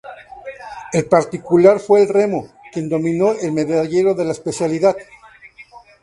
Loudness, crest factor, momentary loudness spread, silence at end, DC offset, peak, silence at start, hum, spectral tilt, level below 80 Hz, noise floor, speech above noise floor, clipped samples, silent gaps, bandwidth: -16 LUFS; 18 dB; 20 LU; 0.25 s; under 0.1%; 0 dBFS; 0.05 s; none; -6.5 dB/octave; -56 dBFS; -43 dBFS; 27 dB; under 0.1%; none; 11.5 kHz